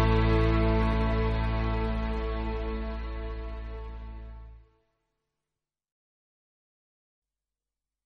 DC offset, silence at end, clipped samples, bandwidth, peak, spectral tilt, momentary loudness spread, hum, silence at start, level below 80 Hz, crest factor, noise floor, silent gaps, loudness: under 0.1%; 3.45 s; under 0.1%; 5.6 kHz; -12 dBFS; -8.5 dB/octave; 18 LU; none; 0 s; -34 dBFS; 18 dB; under -90 dBFS; none; -29 LUFS